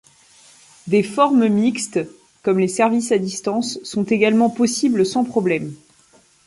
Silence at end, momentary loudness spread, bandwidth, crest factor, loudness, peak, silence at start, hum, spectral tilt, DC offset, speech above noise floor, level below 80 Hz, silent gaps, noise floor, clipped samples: 0.7 s; 9 LU; 11.5 kHz; 16 dB; -19 LUFS; -2 dBFS; 0.85 s; none; -5 dB/octave; under 0.1%; 36 dB; -62 dBFS; none; -54 dBFS; under 0.1%